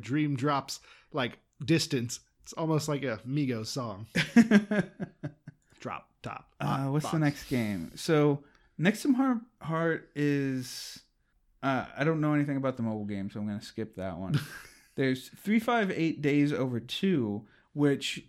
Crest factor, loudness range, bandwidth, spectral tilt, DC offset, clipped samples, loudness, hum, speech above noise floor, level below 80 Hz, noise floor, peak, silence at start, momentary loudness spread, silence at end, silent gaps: 22 dB; 4 LU; 15.5 kHz; -6 dB/octave; under 0.1%; under 0.1%; -30 LUFS; none; 40 dB; -64 dBFS; -70 dBFS; -8 dBFS; 0 s; 14 LU; 0.1 s; none